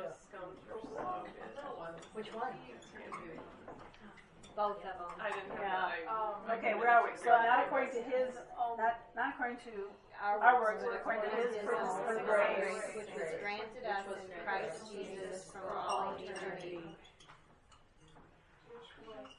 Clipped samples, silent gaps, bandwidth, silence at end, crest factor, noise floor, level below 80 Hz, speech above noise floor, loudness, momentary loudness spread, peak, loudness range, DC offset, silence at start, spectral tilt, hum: under 0.1%; none; 11 kHz; 0.05 s; 26 dB; -64 dBFS; -70 dBFS; 28 dB; -36 LUFS; 21 LU; -12 dBFS; 13 LU; under 0.1%; 0 s; -4 dB/octave; none